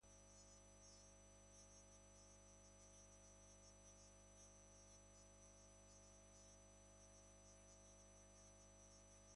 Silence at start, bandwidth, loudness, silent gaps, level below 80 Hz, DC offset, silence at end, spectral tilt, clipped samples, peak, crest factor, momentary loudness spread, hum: 0 s; 11 kHz; -66 LUFS; none; -74 dBFS; under 0.1%; 0 s; -3 dB/octave; under 0.1%; -54 dBFS; 14 dB; 1 LU; 50 Hz at -70 dBFS